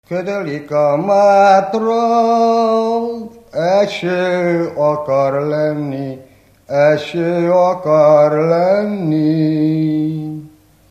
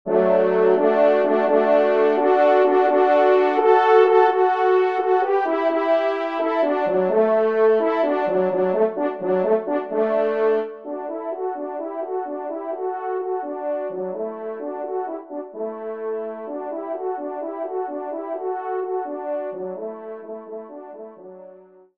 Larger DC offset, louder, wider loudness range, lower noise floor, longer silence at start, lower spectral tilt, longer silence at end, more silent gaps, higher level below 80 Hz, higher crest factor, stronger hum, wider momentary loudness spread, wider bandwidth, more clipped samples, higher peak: neither; first, -14 LUFS vs -21 LUFS; second, 3 LU vs 12 LU; second, -41 dBFS vs -47 dBFS; about the same, 0.1 s vs 0.05 s; about the same, -7 dB/octave vs -7.5 dB/octave; about the same, 0.4 s vs 0.4 s; neither; first, -58 dBFS vs -74 dBFS; about the same, 14 dB vs 18 dB; neither; about the same, 12 LU vs 14 LU; first, 9.2 kHz vs 5.8 kHz; neither; about the same, 0 dBFS vs -2 dBFS